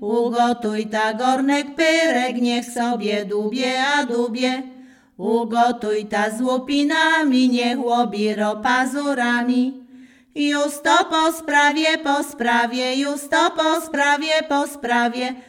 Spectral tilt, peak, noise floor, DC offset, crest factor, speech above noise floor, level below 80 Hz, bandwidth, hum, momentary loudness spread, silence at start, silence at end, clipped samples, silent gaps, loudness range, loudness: -3 dB/octave; -4 dBFS; -46 dBFS; under 0.1%; 16 dB; 27 dB; -64 dBFS; 16.5 kHz; none; 6 LU; 0 s; 0.05 s; under 0.1%; none; 3 LU; -19 LUFS